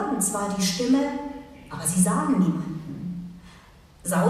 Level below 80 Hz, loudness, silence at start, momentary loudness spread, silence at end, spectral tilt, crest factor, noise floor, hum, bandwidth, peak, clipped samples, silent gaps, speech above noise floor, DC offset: -54 dBFS; -25 LUFS; 0 s; 16 LU; 0 s; -5 dB/octave; 20 dB; -50 dBFS; none; 14.5 kHz; -6 dBFS; under 0.1%; none; 27 dB; under 0.1%